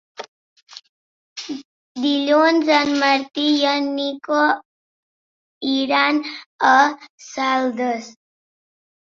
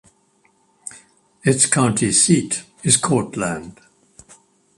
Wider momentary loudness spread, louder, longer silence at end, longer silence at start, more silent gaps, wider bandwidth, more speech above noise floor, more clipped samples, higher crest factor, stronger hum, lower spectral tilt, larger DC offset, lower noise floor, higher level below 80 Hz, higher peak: second, 19 LU vs 22 LU; about the same, -18 LUFS vs -17 LUFS; about the same, 1 s vs 1.05 s; second, 0.2 s vs 0.85 s; first, 0.28-0.56 s, 0.62-0.67 s, 0.89-1.36 s, 1.65-1.95 s, 4.65-5.61 s, 6.46-6.59 s, 7.10-7.18 s vs none; second, 7.6 kHz vs 11.5 kHz; first, over 72 dB vs 42 dB; neither; about the same, 20 dB vs 22 dB; neither; about the same, -2.5 dB/octave vs -3.5 dB/octave; neither; first, under -90 dBFS vs -60 dBFS; second, -70 dBFS vs -54 dBFS; about the same, -2 dBFS vs 0 dBFS